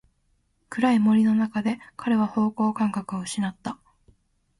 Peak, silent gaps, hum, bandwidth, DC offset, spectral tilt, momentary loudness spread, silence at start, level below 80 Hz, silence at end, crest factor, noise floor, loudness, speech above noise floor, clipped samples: -10 dBFS; none; none; 11.5 kHz; under 0.1%; -6 dB/octave; 15 LU; 0.7 s; -64 dBFS; 0.85 s; 16 dB; -68 dBFS; -24 LUFS; 45 dB; under 0.1%